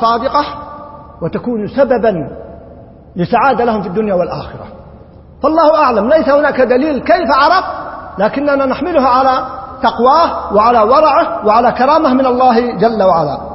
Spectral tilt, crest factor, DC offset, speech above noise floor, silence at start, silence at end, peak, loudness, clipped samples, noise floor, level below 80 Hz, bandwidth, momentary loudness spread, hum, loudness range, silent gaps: -9 dB/octave; 12 dB; under 0.1%; 25 dB; 0 s; 0 s; 0 dBFS; -11 LUFS; under 0.1%; -36 dBFS; -40 dBFS; 5.8 kHz; 14 LU; none; 6 LU; none